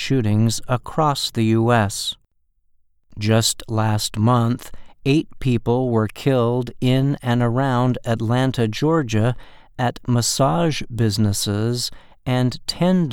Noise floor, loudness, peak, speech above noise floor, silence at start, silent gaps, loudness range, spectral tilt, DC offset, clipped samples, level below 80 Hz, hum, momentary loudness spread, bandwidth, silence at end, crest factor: -62 dBFS; -20 LUFS; -4 dBFS; 43 dB; 0 s; none; 1 LU; -5.5 dB/octave; under 0.1%; under 0.1%; -44 dBFS; none; 6 LU; 17 kHz; 0 s; 16 dB